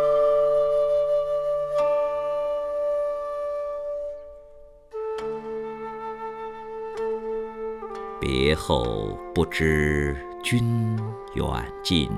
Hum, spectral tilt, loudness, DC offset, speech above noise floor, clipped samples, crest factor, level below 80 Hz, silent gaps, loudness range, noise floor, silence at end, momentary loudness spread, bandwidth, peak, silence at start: none; -6 dB/octave; -26 LUFS; under 0.1%; 23 dB; under 0.1%; 18 dB; -40 dBFS; none; 8 LU; -47 dBFS; 0 s; 13 LU; 14 kHz; -8 dBFS; 0 s